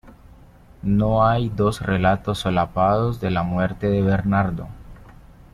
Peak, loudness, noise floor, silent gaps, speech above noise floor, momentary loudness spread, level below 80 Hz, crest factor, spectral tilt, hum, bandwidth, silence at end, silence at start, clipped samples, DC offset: -6 dBFS; -21 LUFS; -47 dBFS; none; 27 dB; 5 LU; -40 dBFS; 16 dB; -7.5 dB/octave; none; 13 kHz; 0.4 s; 0.05 s; under 0.1%; under 0.1%